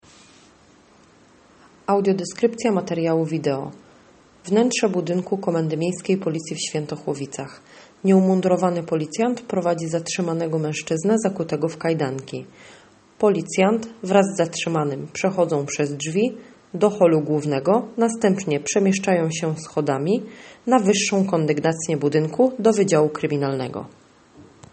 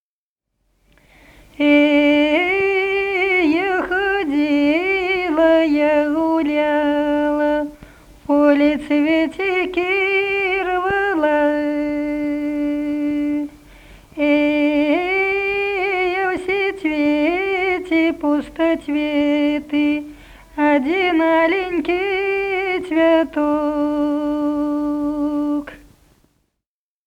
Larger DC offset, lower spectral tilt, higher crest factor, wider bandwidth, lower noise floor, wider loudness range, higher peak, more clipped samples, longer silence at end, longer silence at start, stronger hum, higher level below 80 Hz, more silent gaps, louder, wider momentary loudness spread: neither; about the same, -5.5 dB/octave vs -5.5 dB/octave; about the same, 20 dB vs 16 dB; about the same, 8.8 kHz vs 8.8 kHz; second, -53 dBFS vs -87 dBFS; about the same, 3 LU vs 3 LU; about the same, -2 dBFS vs -2 dBFS; neither; second, 0.3 s vs 1.3 s; first, 1.9 s vs 1.6 s; neither; second, -66 dBFS vs -48 dBFS; neither; second, -21 LUFS vs -18 LUFS; first, 10 LU vs 6 LU